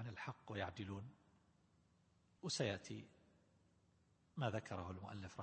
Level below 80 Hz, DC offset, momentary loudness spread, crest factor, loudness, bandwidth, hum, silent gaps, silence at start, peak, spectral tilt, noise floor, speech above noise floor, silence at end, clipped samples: -76 dBFS; under 0.1%; 13 LU; 24 dB; -47 LUFS; 8.4 kHz; none; none; 0 s; -26 dBFS; -4.5 dB/octave; -76 dBFS; 30 dB; 0 s; under 0.1%